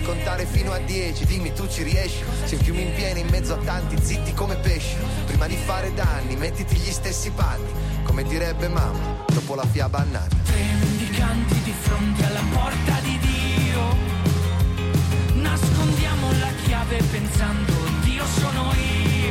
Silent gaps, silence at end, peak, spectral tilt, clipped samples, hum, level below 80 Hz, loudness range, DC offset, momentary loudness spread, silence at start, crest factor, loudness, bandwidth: none; 0 s; -10 dBFS; -5.5 dB/octave; under 0.1%; none; -26 dBFS; 3 LU; under 0.1%; 4 LU; 0 s; 12 dB; -23 LUFS; 16.5 kHz